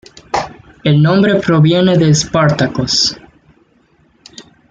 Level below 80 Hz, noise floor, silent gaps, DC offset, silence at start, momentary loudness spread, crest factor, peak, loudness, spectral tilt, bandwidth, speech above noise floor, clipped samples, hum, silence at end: -44 dBFS; -53 dBFS; none; under 0.1%; 0.35 s; 10 LU; 12 dB; -2 dBFS; -12 LUFS; -5.5 dB/octave; 7.8 kHz; 42 dB; under 0.1%; none; 0.3 s